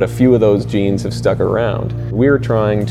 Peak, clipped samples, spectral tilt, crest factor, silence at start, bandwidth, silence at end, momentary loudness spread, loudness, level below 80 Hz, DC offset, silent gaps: 0 dBFS; under 0.1%; -8 dB/octave; 14 dB; 0 s; 12.5 kHz; 0 s; 6 LU; -15 LUFS; -34 dBFS; under 0.1%; none